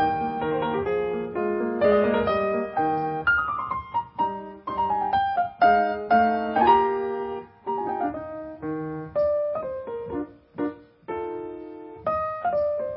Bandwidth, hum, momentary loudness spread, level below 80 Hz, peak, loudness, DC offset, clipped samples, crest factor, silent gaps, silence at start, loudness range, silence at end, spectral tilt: 5.6 kHz; none; 14 LU; -52 dBFS; -6 dBFS; -25 LUFS; under 0.1%; under 0.1%; 18 dB; none; 0 s; 8 LU; 0 s; -10 dB/octave